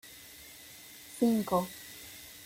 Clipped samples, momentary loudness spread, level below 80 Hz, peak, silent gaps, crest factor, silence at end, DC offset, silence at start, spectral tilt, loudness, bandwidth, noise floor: under 0.1%; 19 LU; -66 dBFS; -16 dBFS; none; 20 dB; 0 s; under 0.1%; 0.05 s; -5 dB/octave; -31 LUFS; 16.5 kHz; -51 dBFS